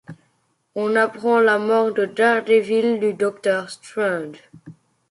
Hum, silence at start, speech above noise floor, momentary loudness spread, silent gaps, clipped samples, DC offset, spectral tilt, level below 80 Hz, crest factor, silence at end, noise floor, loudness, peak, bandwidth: none; 0.1 s; 47 dB; 10 LU; none; under 0.1%; under 0.1%; -5 dB/octave; -70 dBFS; 16 dB; 0.4 s; -67 dBFS; -19 LUFS; -4 dBFS; 11.5 kHz